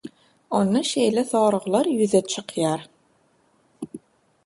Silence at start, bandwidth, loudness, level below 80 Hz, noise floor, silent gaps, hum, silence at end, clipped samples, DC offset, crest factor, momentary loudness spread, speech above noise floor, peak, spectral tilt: 0.05 s; 11.5 kHz; -22 LUFS; -68 dBFS; -63 dBFS; none; none; 0.5 s; under 0.1%; under 0.1%; 18 dB; 18 LU; 42 dB; -6 dBFS; -5 dB/octave